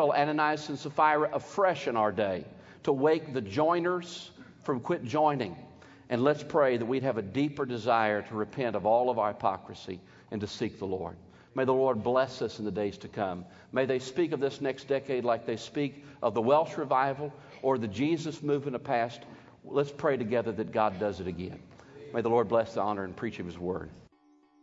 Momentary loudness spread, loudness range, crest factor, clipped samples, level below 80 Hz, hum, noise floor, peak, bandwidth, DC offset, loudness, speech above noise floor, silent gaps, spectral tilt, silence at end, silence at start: 12 LU; 3 LU; 20 dB; under 0.1%; -66 dBFS; none; -64 dBFS; -10 dBFS; 7.8 kHz; under 0.1%; -30 LUFS; 34 dB; none; -6.5 dB/octave; 0.6 s; 0 s